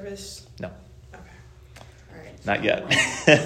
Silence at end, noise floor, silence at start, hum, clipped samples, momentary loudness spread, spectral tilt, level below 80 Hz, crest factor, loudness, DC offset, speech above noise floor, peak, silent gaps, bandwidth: 0 s; -47 dBFS; 0 s; none; under 0.1%; 27 LU; -3.5 dB/octave; -52 dBFS; 24 dB; -22 LUFS; under 0.1%; 24 dB; 0 dBFS; none; 14.5 kHz